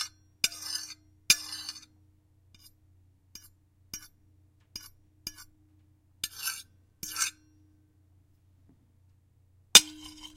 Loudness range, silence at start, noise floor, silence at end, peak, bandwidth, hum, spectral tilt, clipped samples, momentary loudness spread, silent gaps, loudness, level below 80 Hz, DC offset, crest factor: 21 LU; 0 s; -64 dBFS; 0.1 s; 0 dBFS; 16 kHz; none; 1.5 dB/octave; under 0.1%; 27 LU; none; -26 LUFS; -66 dBFS; under 0.1%; 34 dB